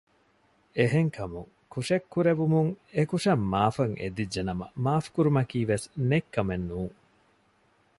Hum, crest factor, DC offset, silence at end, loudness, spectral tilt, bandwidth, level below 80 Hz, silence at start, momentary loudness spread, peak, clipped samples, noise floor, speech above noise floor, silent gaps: none; 20 dB; under 0.1%; 1.1 s; -28 LUFS; -7 dB/octave; 11.5 kHz; -52 dBFS; 0.75 s; 11 LU; -8 dBFS; under 0.1%; -66 dBFS; 39 dB; none